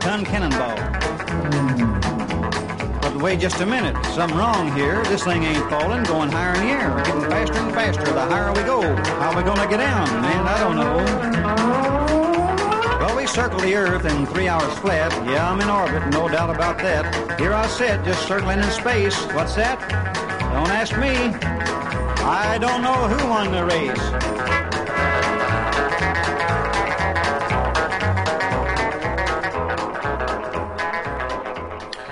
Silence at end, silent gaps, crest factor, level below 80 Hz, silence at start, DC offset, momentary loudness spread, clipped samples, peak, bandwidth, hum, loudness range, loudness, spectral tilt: 0 s; none; 12 dB; -32 dBFS; 0 s; under 0.1%; 5 LU; under 0.1%; -8 dBFS; 11 kHz; none; 2 LU; -20 LUFS; -5 dB/octave